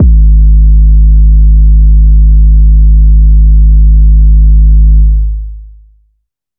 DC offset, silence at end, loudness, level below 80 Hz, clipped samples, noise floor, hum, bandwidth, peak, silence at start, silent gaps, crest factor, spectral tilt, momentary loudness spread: under 0.1%; 0.9 s; -7 LUFS; -4 dBFS; under 0.1%; -60 dBFS; none; 0.4 kHz; 0 dBFS; 0 s; none; 4 dB; -16.5 dB/octave; 2 LU